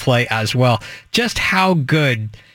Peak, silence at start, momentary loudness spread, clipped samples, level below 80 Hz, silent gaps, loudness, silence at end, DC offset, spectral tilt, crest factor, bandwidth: -2 dBFS; 0 s; 6 LU; under 0.1%; -44 dBFS; none; -17 LUFS; 0.2 s; under 0.1%; -5 dB/octave; 14 dB; 17 kHz